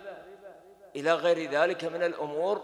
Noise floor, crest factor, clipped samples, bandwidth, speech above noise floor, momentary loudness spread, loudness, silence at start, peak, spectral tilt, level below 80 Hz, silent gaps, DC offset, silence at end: -51 dBFS; 20 dB; under 0.1%; 11 kHz; 23 dB; 19 LU; -28 LUFS; 0 s; -10 dBFS; -4.5 dB/octave; -78 dBFS; none; under 0.1%; 0 s